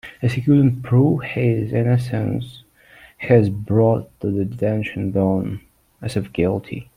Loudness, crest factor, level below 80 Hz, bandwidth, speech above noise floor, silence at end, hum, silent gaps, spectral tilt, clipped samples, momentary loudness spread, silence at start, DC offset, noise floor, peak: -20 LUFS; 16 dB; -50 dBFS; 11.5 kHz; 30 dB; 0.15 s; none; none; -9 dB/octave; under 0.1%; 11 LU; 0.05 s; under 0.1%; -48 dBFS; -2 dBFS